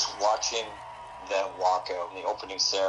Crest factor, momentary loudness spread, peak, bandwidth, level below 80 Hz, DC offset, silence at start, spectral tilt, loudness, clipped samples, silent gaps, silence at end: 18 dB; 15 LU; -12 dBFS; 11 kHz; -62 dBFS; under 0.1%; 0 s; 0 dB/octave; -29 LUFS; under 0.1%; none; 0 s